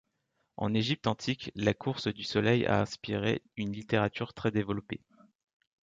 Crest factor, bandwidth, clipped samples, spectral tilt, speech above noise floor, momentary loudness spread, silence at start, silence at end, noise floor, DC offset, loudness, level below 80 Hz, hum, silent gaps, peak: 20 dB; 7.8 kHz; under 0.1%; -6 dB/octave; 48 dB; 10 LU; 0.6 s; 0.85 s; -79 dBFS; under 0.1%; -31 LUFS; -58 dBFS; none; none; -12 dBFS